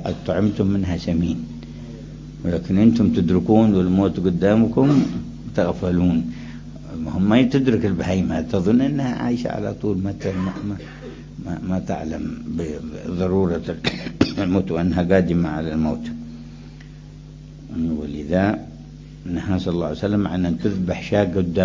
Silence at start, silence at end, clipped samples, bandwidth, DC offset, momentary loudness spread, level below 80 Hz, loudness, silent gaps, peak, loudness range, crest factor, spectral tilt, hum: 0 s; 0 s; under 0.1%; 7.6 kHz; under 0.1%; 19 LU; -38 dBFS; -21 LUFS; none; -2 dBFS; 8 LU; 20 dB; -8 dB/octave; none